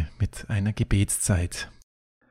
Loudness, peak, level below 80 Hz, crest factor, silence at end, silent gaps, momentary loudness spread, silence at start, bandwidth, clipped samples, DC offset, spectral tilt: -26 LUFS; -8 dBFS; -36 dBFS; 18 dB; 0.6 s; none; 10 LU; 0 s; 16 kHz; under 0.1%; under 0.1%; -5 dB/octave